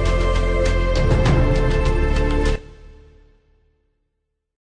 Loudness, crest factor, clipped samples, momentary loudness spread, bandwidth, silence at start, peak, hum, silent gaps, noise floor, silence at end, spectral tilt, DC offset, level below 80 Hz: -20 LUFS; 12 dB; under 0.1%; 4 LU; 10 kHz; 0 s; -6 dBFS; none; none; -75 dBFS; 1.85 s; -6.5 dB/octave; under 0.1%; -22 dBFS